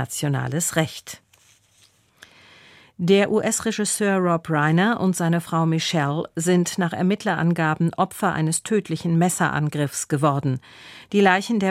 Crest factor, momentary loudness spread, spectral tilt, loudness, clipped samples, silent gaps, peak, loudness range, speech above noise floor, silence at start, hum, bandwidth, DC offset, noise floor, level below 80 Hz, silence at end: 18 dB; 7 LU; -5 dB/octave; -21 LUFS; under 0.1%; none; -2 dBFS; 4 LU; 37 dB; 0 s; none; 15.5 kHz; under 0.1%; -58 dBFS; -60 dBFS; 0 s